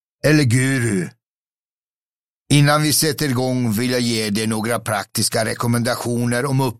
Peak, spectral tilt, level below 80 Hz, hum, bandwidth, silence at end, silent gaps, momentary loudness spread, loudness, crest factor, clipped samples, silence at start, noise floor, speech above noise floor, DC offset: -2 dBFS; -4.5 dB/octave; -52 dBFS; none; 16 kHz; 0.05 s; 1.28-1.45 s, 1.53-2.46 s; 7 LU; -18 LUFS; 16 dB; under 0.1%; 0.25 s; under -90 dBFS; over 72 dB; 0.2%